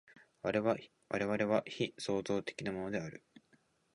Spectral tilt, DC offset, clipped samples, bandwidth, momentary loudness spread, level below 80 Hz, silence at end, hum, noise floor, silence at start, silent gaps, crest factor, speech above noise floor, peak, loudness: -5.5 dB/octave; under 0.1%; under 0.1%; 11 kHz; 8 LU; -70 dBFS; 0.75 s; none; -72 dBFS; 0.15 s; none; 22 dB; 36 dB; -16 dBFS; -37 LUFS